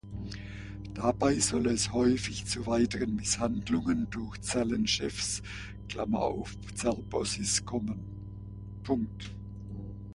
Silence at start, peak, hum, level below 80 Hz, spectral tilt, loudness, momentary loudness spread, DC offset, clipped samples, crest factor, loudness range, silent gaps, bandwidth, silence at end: 0.05 s; -12 dBFS; 60 Hz at -45 dBFS; -48 dBFS; -4 dB/octave; -31 LUFS; 15 LU; under 0.1%; under 0.1%; 20 dB; 5 LU; none; 11.5 kHz; 0 s